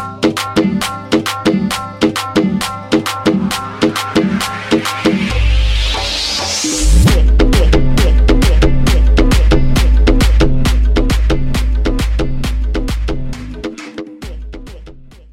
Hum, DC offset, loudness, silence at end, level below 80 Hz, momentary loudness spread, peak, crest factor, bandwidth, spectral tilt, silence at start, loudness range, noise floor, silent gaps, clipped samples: none; under 0.1%; -14 LUFS; 0.25 s; -14 dBFS; 13 LU; -2 dBFS; 10 dB; 15 kHz; -5 dB/octave; 0 s; 6 LU; -35 dBFS; none; under 0.1%